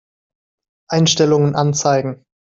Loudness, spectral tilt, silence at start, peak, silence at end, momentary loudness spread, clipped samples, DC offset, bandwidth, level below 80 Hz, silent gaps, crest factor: -15 LUFS; -5 dB/octave; 0.9 s; -2 dBFS; 0.4 s; 11 LU; under 0.1%; under 0.1%; 7.8 kHz; -56 dBFS; none; 16 dB